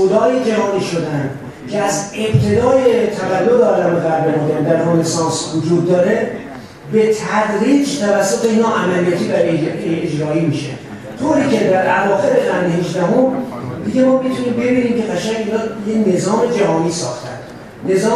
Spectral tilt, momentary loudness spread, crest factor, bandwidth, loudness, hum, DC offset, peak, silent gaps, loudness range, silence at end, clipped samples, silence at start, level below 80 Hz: -5.5 dB/octave; 10 LU; 14 dB; 13.5 kHz; -15 LUFS; none; under 0.1%; 0 dBFS; none; 2 LU; 0 s; under 0.1%; 0 s; -50 dBFS